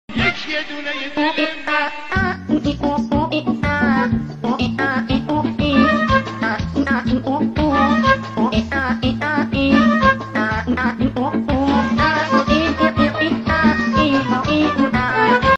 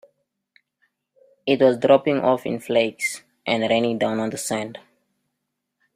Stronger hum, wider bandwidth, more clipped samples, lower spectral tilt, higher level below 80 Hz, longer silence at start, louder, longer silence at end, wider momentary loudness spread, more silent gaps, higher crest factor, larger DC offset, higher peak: neither; second, 8 kHz vs 15.5 kHz; neither; first, -6.5 dB/octave vs -4.5 dB/octave; first, -34 dBFS vs -66 dBFS; second, 0.1 s vs 1.45 s; first, -17 LUFS vs -21 LUFS; second, 0 s vs 1.15 s; second, 6 LU vs 10 LU; neither; second, 14 dB vs 20 dB; neither; about the same, -2 dBFS vs -4 dBFS